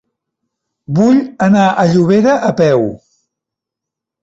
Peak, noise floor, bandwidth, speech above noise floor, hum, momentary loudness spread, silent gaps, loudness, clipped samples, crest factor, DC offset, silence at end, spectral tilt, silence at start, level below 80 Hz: 0 dBFS; -82 dBFS; 8 kHz; 72 dB; none; 5 LU; none; -12 LUFS; under 0.1%; 12 dB; under 0.1%; 1.25 s; -7.5 dB/octave; 0.9 s; -52 dBFS